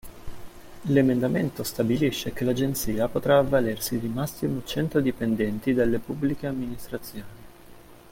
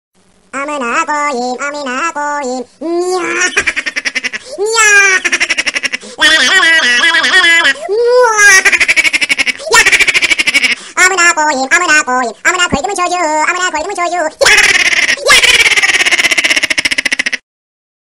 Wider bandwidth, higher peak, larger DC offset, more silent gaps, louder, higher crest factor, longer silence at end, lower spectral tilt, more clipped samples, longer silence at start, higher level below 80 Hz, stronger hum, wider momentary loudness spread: about the same, 17 kHz vs 17 kHz; second, -6 dBFS vs 0 dBFS; second, under 0.1% vs 0.2%; neither; second, -26 LUFS vs -8 LUFS; first, 20 dB vs 10 dB; second, 0.15 s vs 0.65 s; first, -6 dB/octave vs 0 dB/octave; second, under 0.1% vs 0.2%; second, 0.05 s vs 0.55 s; about the same, -48 dBFS vs -44 dBFS; neither; first, 15 LU vs 12 LU